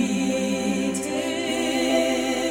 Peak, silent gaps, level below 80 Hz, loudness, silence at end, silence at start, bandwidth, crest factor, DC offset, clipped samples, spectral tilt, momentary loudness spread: -10 dBFS; none; -60 dBFS; -24 LUFS; 0 s; 0 s; 17 kHz; 14 dB; under 0.1%; under 0.1%; -4 dB/octave; 4 LU